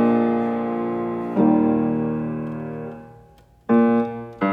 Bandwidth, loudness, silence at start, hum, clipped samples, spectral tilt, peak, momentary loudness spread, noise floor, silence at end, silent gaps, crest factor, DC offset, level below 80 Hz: 4 kHz; -21 LUFS; 0 s; none; under 0.1%; -10 dB/octave; -6 dBFS; 15 LU; -51 dBFS; 0 s; none; 14 dB; under 0.1%; -54 dBFS